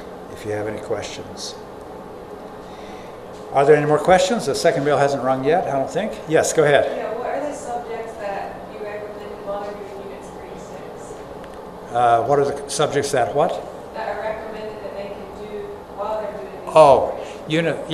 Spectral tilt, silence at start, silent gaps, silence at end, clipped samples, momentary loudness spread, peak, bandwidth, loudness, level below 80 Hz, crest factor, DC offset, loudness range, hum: -4.5 dB/octave; 0 s; none; 0 s; under 0.1%; 20 LU; 0 dBFS; 15 kHz; -20 LUFS; -50 dBFS; 22 dB; under 0.1%; 13 LU; none